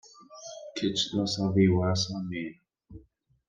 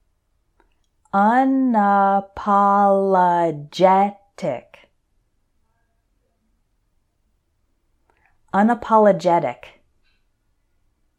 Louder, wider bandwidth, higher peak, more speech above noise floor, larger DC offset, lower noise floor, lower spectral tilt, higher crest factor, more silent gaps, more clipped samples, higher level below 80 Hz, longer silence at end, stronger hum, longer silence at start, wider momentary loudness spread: second, -28 LUFS vs -18 LUFS; about the same, 9.4 kHz vs 9.4 kHz; second, -10 dBFS vs -2 dBFS; second, 35 dB vs 50 dB; neither; second, -62 dBFS vs -67 dBFS; second, -5.5 dB/octave vs -7.5 dB/octave; about the same, 20 dB vs 18 dB; neither; neither; about the same, -60 dBFS vs -60 dBFS; second, 0.5 s vs 1.65 s; neither; second, 0.2 s vs 1.15 s; first, 19 LU vs 12 LU